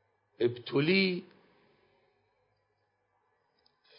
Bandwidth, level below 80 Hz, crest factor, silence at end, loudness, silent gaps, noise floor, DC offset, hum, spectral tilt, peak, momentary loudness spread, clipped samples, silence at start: 5.4 kHz; -82 dBFS; 20 dB; 2.75 s; -30 LUFS; none; -77 dBFS; under 0.1%; none; -9.5 dB/octave; -14 dBFS; 7 LU; under 0.1%; 0.4 s